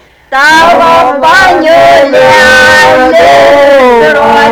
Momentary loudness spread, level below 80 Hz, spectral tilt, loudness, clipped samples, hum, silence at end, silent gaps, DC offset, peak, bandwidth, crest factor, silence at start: 3 LU; -34 dBFS; -3 dB/octave; -3 LUFS; 6%; none; 0 s; none; 0.8%; 0 dBFS; over 20 kHz; 4 dB; 0.3 s